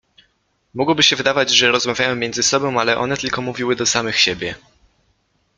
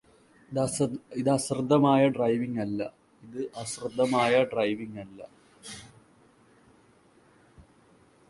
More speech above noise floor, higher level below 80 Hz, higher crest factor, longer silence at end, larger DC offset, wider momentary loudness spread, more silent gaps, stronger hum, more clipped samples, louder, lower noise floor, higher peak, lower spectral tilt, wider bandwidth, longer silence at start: first, 46 dB vs 34 dB; first, -54 dBFS vs -66 dBFS; about the same, 20 dB vs 20 dB; first, 1 s vs 0.7 s; neither; second, 9 LU vs 21 LU; neither; neither; neither; first, -16 LUFS vs -27 LUFS; first, -64 dBFS vs -60 dBFS; first, 0 dBFS vs -10 dBFS; second, -2 dB/octave vs -5.5 dB/octave; about the same, 12 kHz vs 11.5 kHz; first, 0.75 s vs 0.5 s